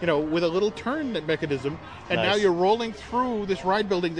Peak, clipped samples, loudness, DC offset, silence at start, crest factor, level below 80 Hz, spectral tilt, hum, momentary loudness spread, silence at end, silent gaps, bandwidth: -10 dBFS; under 0.1%; -25 LUFS; under 0.1%; 0 s; 16 dB; -52 dBFS; -5.5 dB/octave; none; 7 LU; 0 s; none; 10 kHz